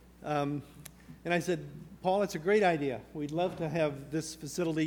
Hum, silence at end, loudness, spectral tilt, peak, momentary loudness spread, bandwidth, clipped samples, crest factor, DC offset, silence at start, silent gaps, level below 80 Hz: none; 0 s; -32 LUFS; -5.5 dB/octave; -14 dBFS; 15 LU; 19.5 kHz; under 0.1%; 18 dB; under 0.1%; 0.2 s; none; -62 dBFS